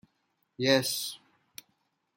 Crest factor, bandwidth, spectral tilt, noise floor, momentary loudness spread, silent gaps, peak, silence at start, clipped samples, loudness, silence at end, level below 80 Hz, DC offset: 24 dB; 16.5 kHz; -3.5 dB/octave; -76 dBFS; 24 LU; none; -10 dBFS; 0.6 s; under 0.1%; -28 LUFS; 1 s; -76 dBFS; under 0.1%